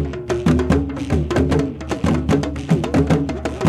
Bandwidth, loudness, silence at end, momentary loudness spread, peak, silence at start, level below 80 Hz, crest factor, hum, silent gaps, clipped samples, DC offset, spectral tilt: 12.5 kHz; -19 LUFS; 0 s; 5 LU; -4 dBFS; 0 s; -30 dBFS; 14 dB; none; none; under 0.1%; under 0.1%; -7 dB/octave